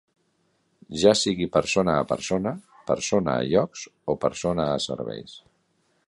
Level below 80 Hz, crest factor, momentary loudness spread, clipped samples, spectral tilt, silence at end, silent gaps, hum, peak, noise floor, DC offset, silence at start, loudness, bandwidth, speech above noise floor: -52 dBFS; 22 dB; 14 LU; under 0.1%; -4.5 dB/octave; 0.7 s; none; none; -4 dBFS; -69 dBFS; under 0.1%; 0.9 s; -24 LUFS; 11.5 kHz; 45 dB